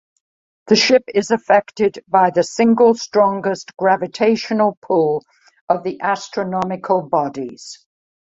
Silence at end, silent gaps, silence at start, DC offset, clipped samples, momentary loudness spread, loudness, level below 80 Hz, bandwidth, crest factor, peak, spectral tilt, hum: 0.65 s; 4.77-4.82 s, 5.61-5.67 s; 0.65 s; under 0.1%; under 0.1%; 9 LU; -17 LUFS; -62 dBFS; 8 kHz; 16 dB; -2 dBFS; -4.5 dB/octave; none